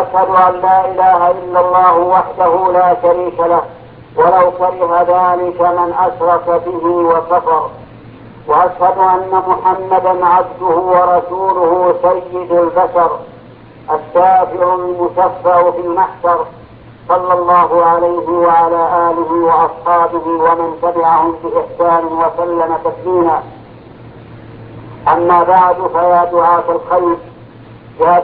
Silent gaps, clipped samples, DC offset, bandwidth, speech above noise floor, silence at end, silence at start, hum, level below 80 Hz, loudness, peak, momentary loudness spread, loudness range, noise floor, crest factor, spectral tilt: none; under 0.1%; under 0.1%; 4.6 kHz; 25 dB; 0 s; 0 s; none; -48 dBFS; -12 LUFS; 0 dBFS; 6 LU; 3 LU; -36 dBFS; 12 dB; -10.5 dB/octave